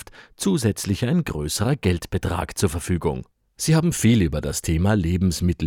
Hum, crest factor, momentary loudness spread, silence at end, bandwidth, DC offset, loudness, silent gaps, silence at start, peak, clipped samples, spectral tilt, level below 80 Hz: none; 16 dB; 7 LU; 0 s; 17.5 kHz; under 0.1%; -22 LUFS; none; 0 s; -6 dBFS; under 0.1%; -5.5 dB/octave; -40 dBFS